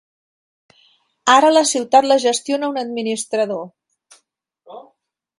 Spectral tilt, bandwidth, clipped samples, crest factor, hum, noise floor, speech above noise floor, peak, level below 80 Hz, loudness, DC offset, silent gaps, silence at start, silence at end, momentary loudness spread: -2 dB/octave; 11.5 kHz; under 0.1%; 20 dB; none; -65 dBFS; 49 dB; 0 dBFS; -70 dBFS; -16 LUFS; under 0.1%; none; 1.25 s; 0.55 s; 11 LU